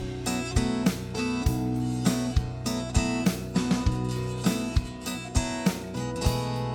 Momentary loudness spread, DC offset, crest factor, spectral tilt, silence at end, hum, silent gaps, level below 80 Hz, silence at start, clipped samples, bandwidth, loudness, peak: 5 LU; under 0.1%; 18 dB; -5.5 dB/octave; 0 s; none; none; -36 dBFS; 0 s; under 0.1%; over 20 kHz; -28 LUFS; -10 dBFS